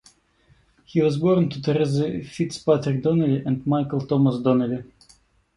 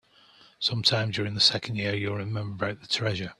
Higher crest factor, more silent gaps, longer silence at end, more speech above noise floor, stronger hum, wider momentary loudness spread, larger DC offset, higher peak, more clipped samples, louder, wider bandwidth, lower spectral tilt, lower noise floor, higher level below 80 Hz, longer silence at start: second, 16 dB vs 22 dB; neither; first, 0.75 s vs 0.05 s; first, 38 dB vs 29 dB; neither; about the same, 8 LU vs 10 LU; neither; about the same, -6 dBFS vs -8 dBFS; neither; first, -22 LUFS vs -26 LUFS; about the same, 11.5 kHz vs 12 kHz; first, -8 dB/octave vs -4 dB/octave; about the same, -60 dBFS vs -57 dBFS; first, -56 dBFS vs -62 dBFS; first, 0.95 s vs 0.6 s